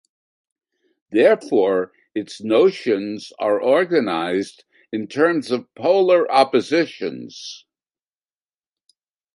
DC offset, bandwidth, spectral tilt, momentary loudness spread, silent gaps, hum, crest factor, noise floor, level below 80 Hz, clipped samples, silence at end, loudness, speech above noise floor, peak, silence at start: under 0.1%; 11.5 kHz; -5.5 dB/octave; 14 LU; none; none; 18 dB; under -90 dBFS; -70 dBFS; under 0.1%; 1.8 s; -19 LUFS; over 71 dB; -2 dBFS; 1.1 s